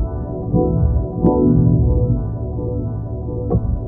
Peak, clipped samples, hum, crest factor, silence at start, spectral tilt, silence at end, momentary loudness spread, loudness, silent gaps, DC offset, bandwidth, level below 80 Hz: -2 dBFS; under 0.1%; none; 16 dB; 0 s; -15.5 dB/octave; 0 s; 11 LU; -18 LUFS; none; under 0.1%; 1.6 kHz; -24 dBFS